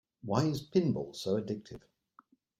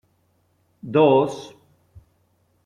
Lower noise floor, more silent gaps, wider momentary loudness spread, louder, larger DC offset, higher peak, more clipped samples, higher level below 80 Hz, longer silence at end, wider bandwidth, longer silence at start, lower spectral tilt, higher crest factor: about the same, -65 dBFS vs -65 dBFS; neither; second, 14 LU vs 26 LU; second, -33 LUFS vs -19 LUFS; neither; second, -14 dBFS vs -4 dBFS; neither; about the same, -66 dBFS vs -62 dBFS; second, 0.8 s vs 1.2 s; first, 16 kHz vs 10.5 kHz; second, 0.25 s vs 0.85 s; about the same, -7 dB/octave vs -7 dB/octave; about the same, 22 dB vs 20 dB